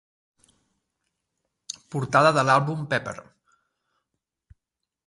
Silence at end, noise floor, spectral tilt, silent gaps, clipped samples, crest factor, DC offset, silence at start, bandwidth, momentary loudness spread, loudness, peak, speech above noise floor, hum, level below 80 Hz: 1.85 s; -85 dBFS; -5 dB/octave; none; under 0.1%; 24 dB; under 0.1%; 1.9 s; 11.5 kHz; 20 LU; -22 LUFS; -4 dBFS; 63 dB; none; -64 dBFS